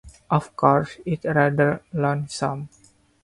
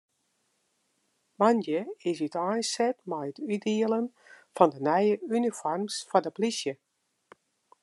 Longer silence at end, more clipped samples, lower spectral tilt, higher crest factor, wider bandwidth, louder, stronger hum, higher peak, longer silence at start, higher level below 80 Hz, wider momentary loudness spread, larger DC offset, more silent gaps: second, 0.55 s vs 1.1 s; neither; first, -7 dB/octave vs -4.5 dB/octave; about the same, 20 dB vs 24 dB; about the same, 11.5 kHz vs 12 kHz; first, -22 LUFS vs -28 LUFS; neither; first, -2 dBFS vs -6 dBFS; second, 0.05 s vs 1.4 s; first, -54 dBFS vs -86 dBFS; about the same, 9 LU vs 10 LU; neither; neither